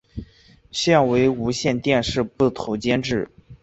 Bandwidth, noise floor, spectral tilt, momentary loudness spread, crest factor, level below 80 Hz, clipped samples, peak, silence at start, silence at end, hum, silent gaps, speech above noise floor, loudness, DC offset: 8.2 kHz; -52 dBFS; -5 dB/octave; 13 LU; 18 dB; -46 dBFS; under 0.1%; -4 dBFS; 0.15 s; 0.1 s; none; none; 32 dB; -21 LUFS; under 0.1%